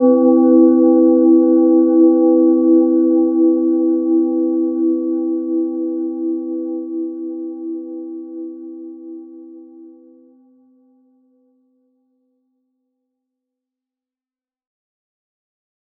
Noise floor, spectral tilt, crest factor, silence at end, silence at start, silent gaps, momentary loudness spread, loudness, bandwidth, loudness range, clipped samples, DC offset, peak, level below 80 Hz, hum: under -90 dBFS; -12 dB/octave; 16 dB; 6.1 s; 0 s; none; 19 LU; -14 LUFS; 1.6 kHz; 21 LU; under 0.1%; under 0.1%; -2 dBFS; -78 dBFS; none